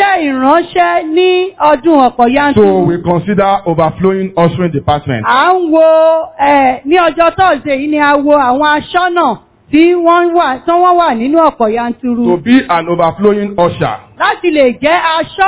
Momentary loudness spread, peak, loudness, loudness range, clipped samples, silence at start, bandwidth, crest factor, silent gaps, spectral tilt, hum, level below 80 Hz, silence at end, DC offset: 5 LU; 0 dBFS; -10 LUFS; 2 LU; 1%; 0 s; 4 kHz; 10 dB; none; -10 dB/octave; none; -40 dBFS; 0 s; under 0.1%